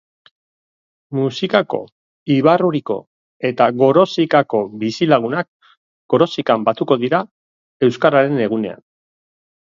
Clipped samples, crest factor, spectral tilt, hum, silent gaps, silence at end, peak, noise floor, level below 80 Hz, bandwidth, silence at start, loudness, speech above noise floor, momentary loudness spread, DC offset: under 0.1%; 18 dB; -7 dB/octave; none; 1.92-2.26 s, 3.07-3.40 s, 5.48-5.60 s, 5.77-6.09 s, 7.31-7.80 s; 0.9 s; 0 dBFS; under -90 dBFS; -64 dBFS; 7.6 kHz; 1.1 s; -17 LUFS; over 74 dB; 12 LU; under 0.1%